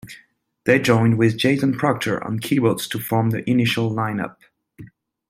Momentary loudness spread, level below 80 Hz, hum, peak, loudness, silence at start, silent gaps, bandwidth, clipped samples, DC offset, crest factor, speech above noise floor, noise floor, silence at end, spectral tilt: 9 LU; -58 dBFS; none; -2 dBFS; -20 LUFS; 0.05 s; none; 16 kHz; under 0.1%; under 0.1%; 18 dB; 36 dB; -56 dBFS; 0.45 s; -6 dB/octave